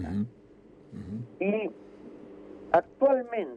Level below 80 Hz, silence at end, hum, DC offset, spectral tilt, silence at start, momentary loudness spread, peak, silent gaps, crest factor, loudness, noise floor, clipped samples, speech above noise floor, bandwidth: -58 dBFS; 0 s; none; under 0.1%; -9 dB/octave; 0 s; 23 LU; -12 dBFS; none; 20 dB; -29 LUFS; -54 dBFS; under 0.1%; 26 dB; 5.2 kHz